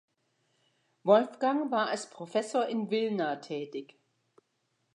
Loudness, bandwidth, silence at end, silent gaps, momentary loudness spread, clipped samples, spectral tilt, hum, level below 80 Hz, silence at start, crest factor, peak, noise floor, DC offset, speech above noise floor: -30 LUFS; 11 kHz; 1.1 s; none; 13 LU; under 0.1%; -5 dB/octave; none; -88 dBFS; 1.05 s; 22 dB; -10 dBFS; -78 dBFS; under 0.1%; 48 dB